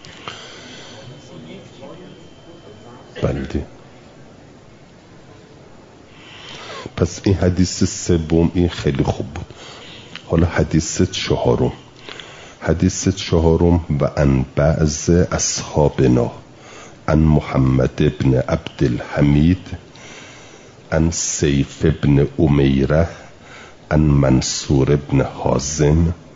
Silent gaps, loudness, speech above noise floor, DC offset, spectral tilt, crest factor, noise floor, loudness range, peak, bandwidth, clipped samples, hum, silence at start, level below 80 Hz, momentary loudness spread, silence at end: none; -17 LUFS; 28 dB; 0.1%; -6 dB/octave; 16 dB; -44 dBFS; 13 LU; -2 dBFS; 7.8 kHz; under 0.1%; none; 0.05 s; -34 dBFS; 22 LU; 0.2 s